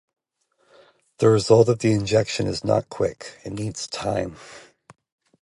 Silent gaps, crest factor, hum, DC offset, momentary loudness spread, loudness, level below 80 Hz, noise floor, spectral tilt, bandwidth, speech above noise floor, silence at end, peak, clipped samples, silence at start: none; 20 dB; none; under 0.1%; 16 LU; -21 LUFS; -52 dBFS; -69 dBFS; -6 dB/octave; 11.5 kHz; 48 dB; 0.85 s; -2 dBFS; under 0.1%; 1.2 s